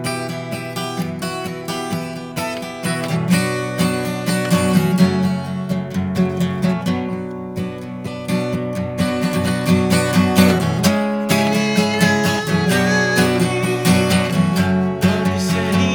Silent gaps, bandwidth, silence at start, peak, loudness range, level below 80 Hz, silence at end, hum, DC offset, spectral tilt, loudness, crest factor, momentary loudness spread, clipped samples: none; over 20 kHz; 0 s; 0 dBFS; 6 LU; -50 dBFS; 0 s; none; under 0.1%; -5.5 dB/octave; -18 LUFS; 18 dB; 10 LU; under 0.1%